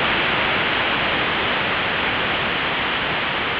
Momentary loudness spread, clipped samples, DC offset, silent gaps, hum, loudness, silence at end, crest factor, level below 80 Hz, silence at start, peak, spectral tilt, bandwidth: 2 LU; under 0.1%; under 0.1%; none; none; -19 LUFS; 0 s; 14 dB; -44 dBFS; 0 s; -6 dBFS; -6 dB/octave; 5.4 kHz